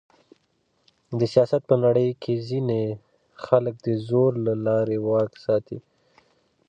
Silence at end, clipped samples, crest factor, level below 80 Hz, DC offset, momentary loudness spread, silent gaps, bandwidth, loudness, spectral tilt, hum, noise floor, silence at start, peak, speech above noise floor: 0.9 s; under 0.1%; 20 dB; -64 dBFS; under 0.1%; 11 LU; none; 9 kHz; -23 LUFS; -9 dB/octave; none; -69 dBFS; 1.1 s; -4 dBFS; 47 dB